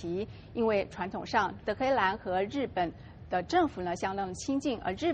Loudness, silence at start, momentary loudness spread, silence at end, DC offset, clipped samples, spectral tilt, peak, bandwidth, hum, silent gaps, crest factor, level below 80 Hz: -31 LUFS; 0 s; 8 LU; 0 s; under 0.1%; under 0.1%; -5 dB/octave; -12 dBFS; 8.8 kHz; none; none; 18 dB; -54 dBFS